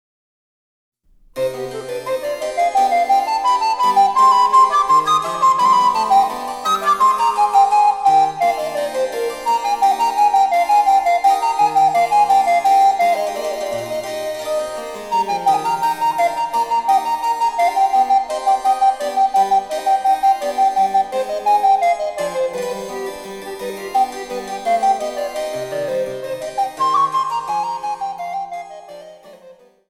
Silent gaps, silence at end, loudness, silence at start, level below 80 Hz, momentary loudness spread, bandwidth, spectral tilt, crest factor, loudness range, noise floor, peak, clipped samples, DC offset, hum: none; 0.35 s; -17 LUFS; 1.35 s; -56 dBFS; 12 LU; 16 kHz; -2.5 dB/octave; 14 dB; 8 LU; -46 dBFS; -2 dBFS; under 0.1%; under 0.1%; none